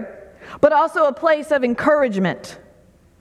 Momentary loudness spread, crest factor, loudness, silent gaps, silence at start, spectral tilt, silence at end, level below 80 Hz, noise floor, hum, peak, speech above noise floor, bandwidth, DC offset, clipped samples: 19 LU; 18 dB; -18 LUFS; none; 0 s; -6 dB/octave; 0.65 s; -56 dBFS; -52 dBFS; none; -2 dBFS; 34 dB; 12 kHz; under 0.1%; under 0.1%